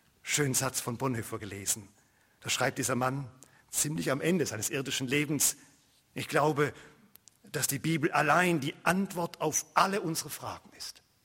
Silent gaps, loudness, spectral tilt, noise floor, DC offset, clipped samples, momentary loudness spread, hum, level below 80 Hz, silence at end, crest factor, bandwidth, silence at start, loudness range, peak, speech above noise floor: none; -30 LUFS; -3.5 dB/octave; -60 dBFS; under 0.1%; under 0.1%; 13 LU; none; -66 dBFS; 0.35 s; 24 dB; 16.5 kHz; 0.25 s; 3 LU; -8 dBFS; 30 dB